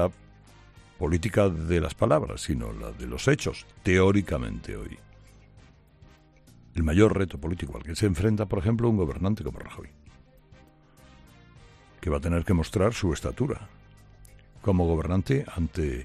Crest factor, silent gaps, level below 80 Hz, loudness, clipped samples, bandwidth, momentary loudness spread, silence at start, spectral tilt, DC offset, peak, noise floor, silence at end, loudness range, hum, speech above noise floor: 22 dB; none; -42 dBFS; -27 LUFS; under 0.1%; 13.5 kHz; 15 LU; 0 s; -6.5 dB/octave; under 0.1%; -6 dBFS; -55 dBFS; 0 s; 5 LU; none; 29 dB